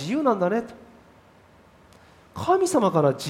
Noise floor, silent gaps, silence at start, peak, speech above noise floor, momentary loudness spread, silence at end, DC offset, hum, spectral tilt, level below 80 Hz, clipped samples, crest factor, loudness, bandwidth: -54 dBFS; none; 0 s; -6 dBFS; 32 dB; 17 LU; 0 s; under 0.1%; none; -6 dB/octave; -62 dBFS; under 0.1%; 18 dB; -22 LUFS; 16 kHz